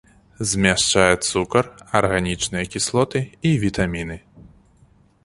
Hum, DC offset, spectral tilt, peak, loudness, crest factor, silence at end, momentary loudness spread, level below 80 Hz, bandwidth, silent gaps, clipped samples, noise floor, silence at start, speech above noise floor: none; under 0.1%; -4 dB/octave; 0 dBFS; -20 LUFS; 20 dB; 0.75 s; 8 LU; -42 dBFS; 11.5 kHz; none; under 0.1%; -55 dBFS; 0.4 s; 35 dB